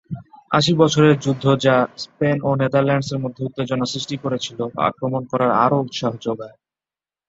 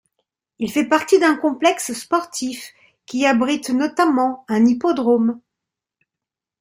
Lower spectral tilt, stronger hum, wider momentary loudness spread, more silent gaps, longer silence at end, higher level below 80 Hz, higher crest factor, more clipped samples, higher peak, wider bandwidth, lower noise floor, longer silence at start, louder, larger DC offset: first, -6 dB/octave vs -4 dB/octave; neither; about the same, 11 LU vs 12 LU; neither; second, 0.8 s vs 1.25 s; first, -56 dBFS vs -64 dBFS; about the same, 18 dB vs 18 dB; neither; about the same, -2 dBFS vs -2 dBFS; second, 8 kHz vs 16 kHz; first, under -90 dBFS vs -86 dBFS; second, 0.1 s vs 0.6 s; about the same, -19 LUFS vs -19 LUFS; neither